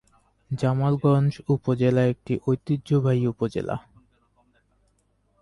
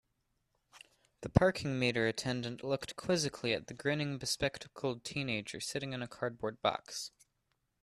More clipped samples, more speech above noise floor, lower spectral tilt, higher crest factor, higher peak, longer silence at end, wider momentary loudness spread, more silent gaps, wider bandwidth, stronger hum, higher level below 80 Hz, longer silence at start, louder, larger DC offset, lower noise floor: neither; about the same, 45 dB vs 46 dB; first, -9 dB/octave vs -4.5 dB/octave; second, 16 dB vs 30 dB; about the same, -10 dBFS vs -8 dBFS; first, 1.6 s vs 0.75 s; about the same, 8 LU vs 8 LU; neither; second, 10.5 kHz vs 13.5 kHz; neither; about the same, -56 dBFS vs -56 dBFS; second, 0.5 s vs 0.75 s; first, -24 LUFS vs -35 LUFS; neither; second, -67 dBFS vs -81 dBFS